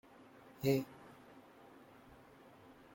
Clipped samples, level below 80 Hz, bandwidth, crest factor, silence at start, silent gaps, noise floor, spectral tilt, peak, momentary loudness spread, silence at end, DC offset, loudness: under 0.1%; -74 dBFS; 16.5 kHz; 24 dB; 0.6 s; none; -61 dBFS; -6.5 dB/octave; -20 dBFS; 25 LU; 1.55 s; under 0.1%; -38 LUFS